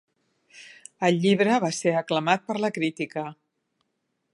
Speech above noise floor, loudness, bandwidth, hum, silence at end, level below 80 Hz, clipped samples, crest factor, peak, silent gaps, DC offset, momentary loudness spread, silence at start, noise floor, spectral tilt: 53 dB; -24 LUFS; 11.5 kHz; none; 1 s; -76 dBFS; under 0.1%; 22 dB; -4 dBFS; none; under 0.1%; 15 LU; 0.55 s; -77 dBFS; -5 dB/octave